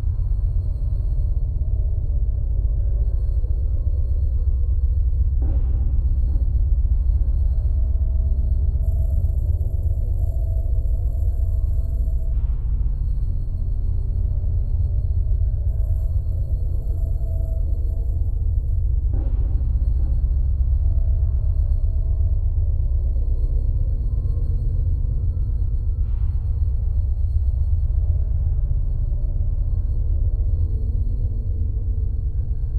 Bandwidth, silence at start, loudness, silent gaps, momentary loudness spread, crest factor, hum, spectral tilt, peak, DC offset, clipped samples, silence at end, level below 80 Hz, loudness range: 1.2 kHz; 0 s; -24 LUFS; none; 3 LU; 12 dB; none; -11 dB/octave; -8 dBFS; under 0.1%; under 0.1%; 0 s; -20 dBFS; 2 LU